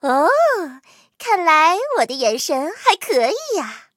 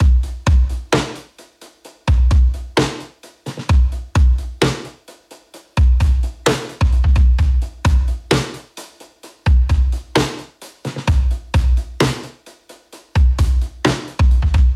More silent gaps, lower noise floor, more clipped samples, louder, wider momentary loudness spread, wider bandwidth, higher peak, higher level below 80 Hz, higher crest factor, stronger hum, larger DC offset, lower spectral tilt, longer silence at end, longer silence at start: neither; about the same, -45 dBFS vs -44 dBFS; neither; about the same, -17 LUFS vs -18 LUFS; second, 10 LU vs 14 LU; first, 16.5 kHz vs 11.5 kHz; about the same, 0 dBFS vs -2 dBFS; second, -84 dBFS vs -18 dBFS; about the same, 18 dB vs 14 dB; neither; neither; second, -1 dB/octave vs -6 dB/octave; first, 0.15 s vs 0 s; about the same, 0.05 s vs 0 s